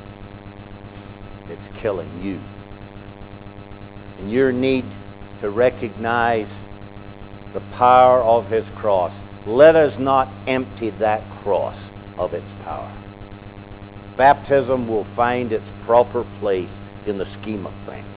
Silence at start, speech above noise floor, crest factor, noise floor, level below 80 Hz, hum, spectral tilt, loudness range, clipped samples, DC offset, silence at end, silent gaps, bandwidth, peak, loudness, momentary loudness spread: 0 s; 18 dB; 20 dB; -37 dBFS; -44 dBFS; none; -10 dB/octave; 12 LU; under 0.1%; under 0.1%; 0 s; none; 4 kHz; 0 dBFS; -19 LUFS; 24 LU